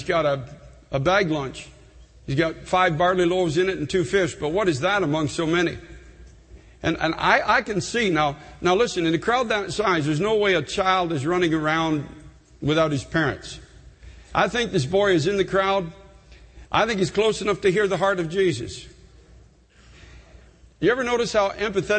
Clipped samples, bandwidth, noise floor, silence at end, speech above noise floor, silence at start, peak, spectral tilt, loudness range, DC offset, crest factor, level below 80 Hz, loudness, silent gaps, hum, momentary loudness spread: under 0.1%; 8.8 kHz; -52 dBFS; 0 s; 31 dB; 0 s; -4 dBFS; -5 dB/octave; 3 LU; under 0.1%; 20 dB; -48 dBFS; -22 LUFS; none; none; 9 LU